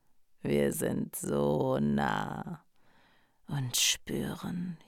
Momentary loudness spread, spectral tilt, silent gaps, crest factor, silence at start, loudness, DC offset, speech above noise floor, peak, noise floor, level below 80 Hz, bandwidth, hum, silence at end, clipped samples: 13 LU; -4 dB/octave; none; 18 dB; 0.45 s; -31 LUFS; under 0.1%; 33 dB; -16 dBFS; -64 dBFS; -58 dBFS; 18 kHz; none; 0.1 s; under 0.1%